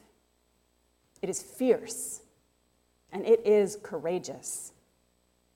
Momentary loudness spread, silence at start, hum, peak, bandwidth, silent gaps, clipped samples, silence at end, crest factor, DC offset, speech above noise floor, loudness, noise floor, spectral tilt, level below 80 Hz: 15 LU; 1.25 s; 60 Hz at -65 dBFS; -12 dBFS; 16 kHz; none; under 0.1%; 0.85 s; 20 dB; under 0.1%; 42 dB; -29 LUFS; -70 dBFS; -4.5 dB/octave; -72 dBFS